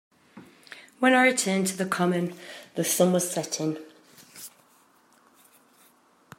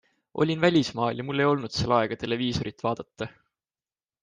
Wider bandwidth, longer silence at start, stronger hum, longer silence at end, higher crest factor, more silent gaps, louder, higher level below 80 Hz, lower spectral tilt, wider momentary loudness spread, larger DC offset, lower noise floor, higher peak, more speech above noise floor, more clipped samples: first, 16 kHz vs 9.6 kHz; about the same, 0.35 s vs 0.35 s; neither; first, 1.9 s vs 0.9 s; about the same, 22 dB vs 20 dB; neither; about the same, -24 LUFS vs -26 LUFS; second, -78 dBFS vs -56 dBFS; second, -4 dB/octave vs -6 dB/octave; first, 24 LU vs 14 LU; neither; second, -61 dBFS vs under -90 dBFS; about the same, -6 dBFS vs -8 dBFS; second, 36 dB vs over 64 dB; neither